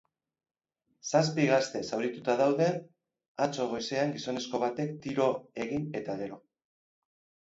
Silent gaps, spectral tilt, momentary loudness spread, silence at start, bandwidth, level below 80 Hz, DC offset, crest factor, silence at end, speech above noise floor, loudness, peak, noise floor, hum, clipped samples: 3.28-3.35 s; -5 dB/octave; 11 LU; 1.05 s; 8 kHz; -70 dBFS; under 0.1%; 20 dB; 1.15 s; 50 dB; -31 LUFS; -12 dBFS; -80 dBFS; none; under 0.1%